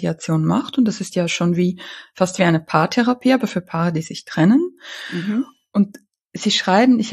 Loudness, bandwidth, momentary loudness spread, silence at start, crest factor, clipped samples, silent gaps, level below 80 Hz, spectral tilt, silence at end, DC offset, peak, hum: -19 LUFS; 13 kHz; 11 LU; 0 s; 16 dB; under 0.1%; 6.26-6.30 s; -62 dBFS; -5.5 dB/octave; 0 s; under 0.1%; -2 dBFS; none